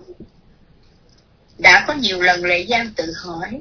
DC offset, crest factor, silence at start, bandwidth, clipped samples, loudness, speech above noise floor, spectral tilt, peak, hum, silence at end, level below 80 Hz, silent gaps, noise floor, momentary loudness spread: under 0.1%; 20 dB; 0.1 s; 5.4 kHz; under 0.1%; -14 LUFS; 33 dB; -2.5 dB/octave; 0 dBFS; none; 0 s; -48 dBFS; none; -52 dBFS; 16 LU